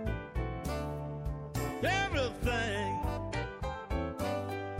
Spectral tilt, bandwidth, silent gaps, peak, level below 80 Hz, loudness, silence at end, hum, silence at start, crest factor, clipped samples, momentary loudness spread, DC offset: -5.5 dB/octave; 16 kHz; none; -20 dBFS; -42 dBFS; -35 LUFS; 0 s; none; 0 s; 16 dB; under 0.1%; 8 LU; under 0.1%